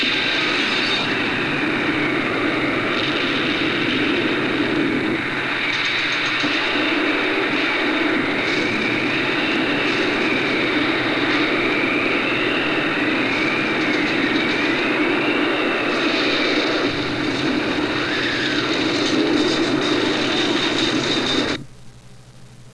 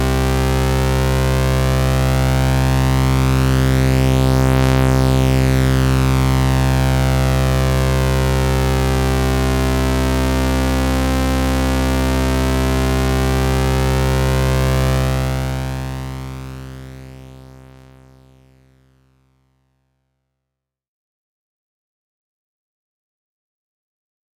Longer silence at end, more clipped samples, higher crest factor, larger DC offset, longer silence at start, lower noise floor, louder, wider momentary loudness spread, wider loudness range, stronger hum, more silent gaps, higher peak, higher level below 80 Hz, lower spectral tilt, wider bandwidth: second, 0 s vs 7 s; neither; about the same, 14 dB vs 10 dB; first, 0.4% vs under 0.1%; about the same, 0 s vs 0 s; second, -43 dBFS vs -82 dBFS; second, -19 LUFS vs -16 LUFS; second, 2 LU vs 6 LU; second, 1 LU vs 8 LU; neither; neither; about the same, -6 dBFS vs -6 dBFS; second, -50 dBFS vs -22 dBFS; second, -4 dB/octave vs -6 dB/octave; second, 11 kHz vs 17.5 kHz